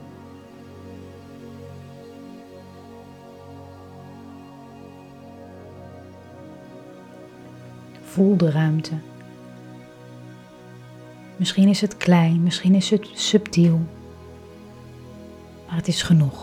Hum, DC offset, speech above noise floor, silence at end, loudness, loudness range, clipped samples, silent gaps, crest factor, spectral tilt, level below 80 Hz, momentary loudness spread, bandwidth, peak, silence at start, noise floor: none; under 0.1%; 25 dB; 0 s; -20 LUFS; 23 LU; under 0.1%; none; 22 dB; -6 dB/octave; -58 dBFS; 25 LU; 12.5 kHz; -4 dBFS; 0 s; -43 dBFS